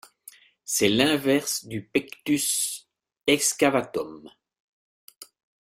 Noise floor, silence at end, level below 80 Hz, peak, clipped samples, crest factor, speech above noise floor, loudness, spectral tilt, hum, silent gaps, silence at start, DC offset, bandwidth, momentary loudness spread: -52 dBFS; 0.45 s; -64 dBFS; -4 dBFS; under 0.1%; 22 dB; 27 dB; -24 LUFS; -2.5 dB/octave; none; 4.60-5.08 s, 5.16-5.21 s; 0.65 s; under 0.1%; 16 kHz; 12 LU